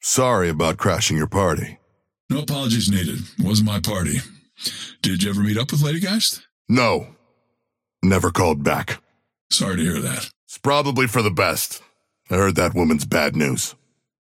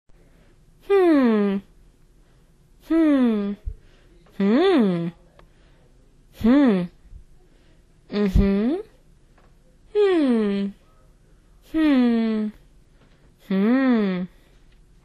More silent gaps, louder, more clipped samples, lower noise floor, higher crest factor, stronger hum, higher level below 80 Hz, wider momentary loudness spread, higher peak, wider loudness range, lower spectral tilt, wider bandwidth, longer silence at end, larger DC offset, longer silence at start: first, 2.20-2.29 s, 6.52-6.65 s, 9.41-9.50 s, 10.36-10.47 s vs none; about the same, -20 LUFS vs -21 LUFS; neither; first, -78 dBFS vs -55 dBFS; about the same, 18 dB vs 18 dB; neither; second, -46 dBFS vs -38 dBFS; second, 9 LU vs 13 LU; about the same, -4 dBFS vs -6 dBFS; about the same, 2 LU vs 3 LU; second, -4.5 dB/octave vs -8.5 dB/octave; first, 17 kHz vs 12.5 kHz; second, 0.55 s vs 0.8 s; neither; second, 0.05 s vs 0.9 s